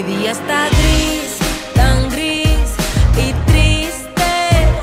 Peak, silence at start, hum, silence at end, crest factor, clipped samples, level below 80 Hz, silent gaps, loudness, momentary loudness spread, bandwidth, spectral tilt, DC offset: 0 dBFS; 0 s; none; 0 s; 14 dB; under 0.1%; -18 dBFS; none; -15 LUFS; 6 LU; 16 kHz; -4.5 dB/octave; under 0.1%